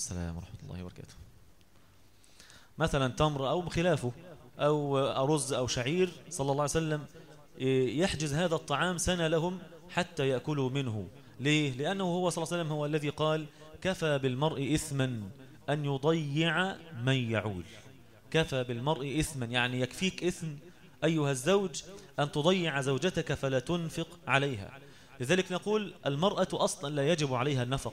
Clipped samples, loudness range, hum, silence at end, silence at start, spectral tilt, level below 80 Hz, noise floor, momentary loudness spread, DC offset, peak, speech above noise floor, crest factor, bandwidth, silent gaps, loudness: under 0.1%; 2 LU; none; 0 s; 0 s; -5 dB/octave; -54 dBFS; -62 dBFS; 12 LU; 0.1%; -10 dBFS; 31 dB; 22 dB; 16 kHz; none; -31 LUFS